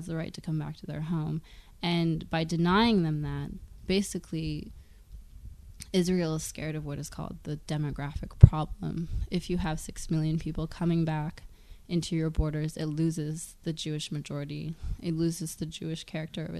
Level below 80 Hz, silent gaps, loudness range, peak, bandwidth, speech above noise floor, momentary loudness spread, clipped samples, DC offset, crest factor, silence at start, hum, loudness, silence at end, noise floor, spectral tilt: -40 dBFS; none; 6 LU; 0 dBFS; 13.5 kHz; 20 dB; 13 LU; under 0.1%; under 0.1%; 30 dB; 0 s; none; -30 LUFS; 0 s; -49 dBFS; -6 dB/octave